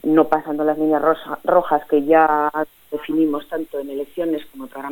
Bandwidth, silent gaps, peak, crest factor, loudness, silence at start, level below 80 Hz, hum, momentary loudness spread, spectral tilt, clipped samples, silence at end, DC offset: 17.5 kHz; none; -2 dBFS; 18 dB; -19 LUFS; 0.05 s; -56 dBFS; none; 13 LU; -7 dB/octave; under 0.1%; 0 s; under 0.1%